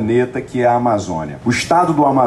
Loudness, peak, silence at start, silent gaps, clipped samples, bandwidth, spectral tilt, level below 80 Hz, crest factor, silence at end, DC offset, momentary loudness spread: -16 LUFS; -4 dBFS; 0 s; none; under 0.1%; 13 kHz; -6 dB/octave; -46 dBFS; 12 dB; 0 s; under 0.1%; 7 LU